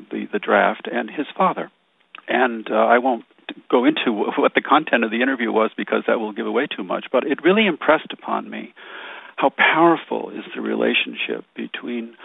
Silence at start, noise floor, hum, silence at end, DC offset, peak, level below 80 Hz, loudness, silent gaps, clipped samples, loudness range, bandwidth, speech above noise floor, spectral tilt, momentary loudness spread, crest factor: 0 s; -47 dBFS; none; 0 s; under 0.1%; -2 dBFS; -76 dBFS; -20 LUFS; none; under 0.1%; 2 LU; 4 kHz; 27 dB; -7.5 dB/octave; 15 LU; 20 dB